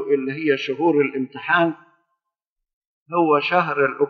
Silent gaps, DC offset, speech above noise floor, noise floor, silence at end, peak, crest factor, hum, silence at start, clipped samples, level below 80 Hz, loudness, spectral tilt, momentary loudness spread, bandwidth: 2.52-2.56 s, 2.73-2.81 s, 2.87-3.06 s; under 0.1%; 63 dB; -82 dBFS; 0 s; -4 dBFS; 18 dB; none; 0 s; under 0.1%; -84 dBFS; -20 LUFS; -3.5 dB/octave; 7 LU; 6.4 kHz